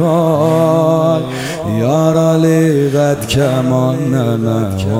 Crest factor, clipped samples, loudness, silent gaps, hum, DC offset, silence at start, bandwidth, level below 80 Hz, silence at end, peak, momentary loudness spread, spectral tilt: 12 dB; under 0.1%; -13 LUFS; none; none; under 0.1%; 0 s; 16 kHz; -44 dBFS; 0 s; 0 dBFS; 5 LU; -7 dB/octave